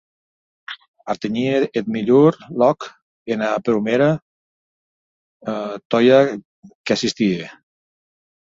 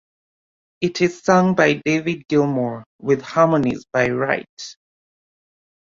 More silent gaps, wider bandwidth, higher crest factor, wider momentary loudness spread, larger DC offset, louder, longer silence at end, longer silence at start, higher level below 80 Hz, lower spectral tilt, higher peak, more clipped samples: first, 0.88-0.94 s, 3.02-3.26 s, 4.22-5.40 s, 5.85-5.90 s, 6.45-6.63 s, 6.75-6.84 s vs 2.86-2.99 s, 4.49-4.57 s; about the same, 7.8 kHz vs 7.6 kHz; about the same, 18 dB vs 20 dB; first, 20 LU vs 11 LU; neither; about the same, -19 LUFS vs -19 LUFS; second, 1.05 s vs 1.2 s; about the same, 0.7 s vs 0.8 s; about the same, -62 dBFS vs -58 dBFS; about the same, -6 dB/octave vs -6 dB/octave; about the same, -2 dBFS vs -2 dBFS; neither